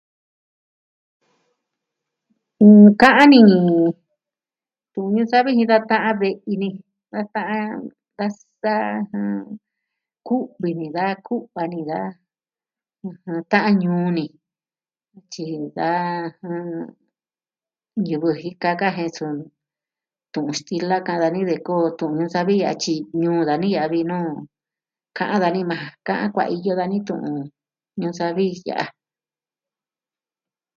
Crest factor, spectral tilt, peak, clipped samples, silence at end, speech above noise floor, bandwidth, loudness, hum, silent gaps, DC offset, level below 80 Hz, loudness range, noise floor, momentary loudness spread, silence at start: 20 dB; -6.5 dB/octave; 0 dBFS; under 0.1%; 1.85 s; over 71 dB; 7.4 kHz; -19 LUFS; none; none; under 0.1%; -66 dBFS; 13 LU; under -90 dBFS; 17 LU; 2.6 s